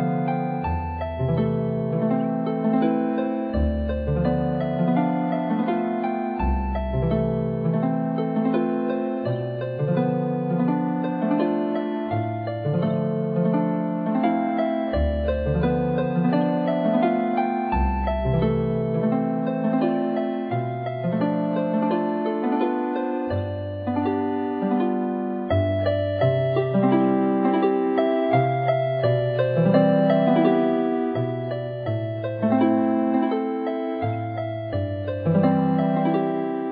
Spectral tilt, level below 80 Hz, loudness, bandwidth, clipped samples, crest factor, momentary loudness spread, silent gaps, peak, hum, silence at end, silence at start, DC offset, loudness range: -11.5 dB/octave; -38 dBFS; -23 LUFS; 4.9 kHz; under 0.1%; 16 dB; 7 LU; none; -8 dBFS; none; 0 s; 0 s; under 0.1%; 4 LU